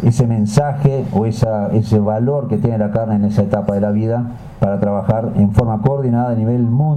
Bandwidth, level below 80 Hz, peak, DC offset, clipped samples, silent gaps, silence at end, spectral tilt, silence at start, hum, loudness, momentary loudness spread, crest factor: 9.8 kHz; -38 dBFS; -4 dBFS; under 0.1%; under 0.1%; none; 0 s; -9 dB/octave; 0 s; none; -16 LUFS; 3 LU; 12 dB